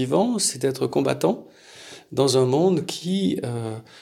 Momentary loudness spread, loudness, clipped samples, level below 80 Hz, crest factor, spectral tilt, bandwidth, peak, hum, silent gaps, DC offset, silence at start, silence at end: 14 LU; -23 LUFS; under 0.1%; -66 dBFS; 18 dB; -5 dB/octave; 16 kHz; -6 dBFS; none; none; under 0.1%; 0 s; 0 s